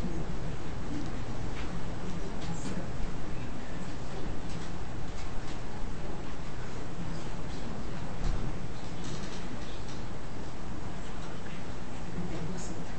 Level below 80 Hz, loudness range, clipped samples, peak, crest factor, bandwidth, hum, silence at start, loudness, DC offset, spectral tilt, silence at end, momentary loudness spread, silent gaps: -40 dBFS; 2 LU; under 0.1%; -16 dBFS; 16 dB; 8.4 kHz; none; 0 s; -40 LUFS; 4%; -5.5 dB/octave; 0 s; 4 LU; none